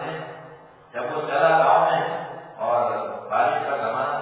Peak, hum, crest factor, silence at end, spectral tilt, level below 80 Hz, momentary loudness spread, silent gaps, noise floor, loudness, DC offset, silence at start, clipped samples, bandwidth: -6 dBFS; none; 18 dB; 0 s; -8.5 dB/octave; -72 dBFS; 18 LU; none; -46 dBFS; -22 LUFS; under 0.1%; 0 s; under 0.1%; 4 kHz